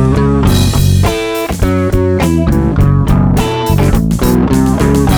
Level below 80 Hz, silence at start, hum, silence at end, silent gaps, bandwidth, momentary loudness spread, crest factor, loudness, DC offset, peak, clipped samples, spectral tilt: -18 dBFS; 0 s; none; 0 s; none; over 20 kHz; 3 LU; 8 dB; -11 LUFS; 0.8%; 0 dBFS; under 0.1%; -6.5 dB/octave